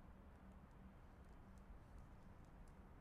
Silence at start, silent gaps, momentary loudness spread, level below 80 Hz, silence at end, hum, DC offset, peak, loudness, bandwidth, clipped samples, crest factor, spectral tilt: 0 s; none; 1 LU; -64 dBFS; 0 s; none; under 0.1%; -50 dBFS; -64 LUFS; 13 kHz; under 0.1%; 12 dB; -7 dB/octave